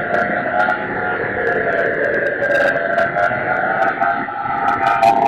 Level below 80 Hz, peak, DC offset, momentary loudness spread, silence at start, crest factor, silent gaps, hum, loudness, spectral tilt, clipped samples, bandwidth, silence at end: -50 dBFS; -2 dBFS; under 0.1%; 5 LU; 0 s; 14 dB; none; none; -17 LUFS; -6 dB/octave; under 0.1%; 12.5 kHz; 0 s